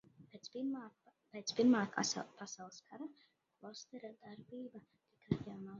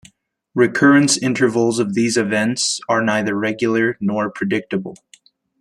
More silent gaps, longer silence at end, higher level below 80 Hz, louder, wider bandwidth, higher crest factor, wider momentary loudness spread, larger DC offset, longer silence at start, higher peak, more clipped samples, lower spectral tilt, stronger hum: neither; second, 0 s vs 0.65 s; second, -74 dBFS vs -62 dBFS; second, -39 LUFS vs -17 LUFS; second, 7.4 kHz vs 12.5 kHz; first, 22 dB vs 16 dB; first, 22 LU vs 9 LU; neither; second, 0.2 s vs 0.55 s; second, -20 dBFS vs -2 dBFS; neither; about the same, -4.5 dB/octave vs -4 dB/octave; neither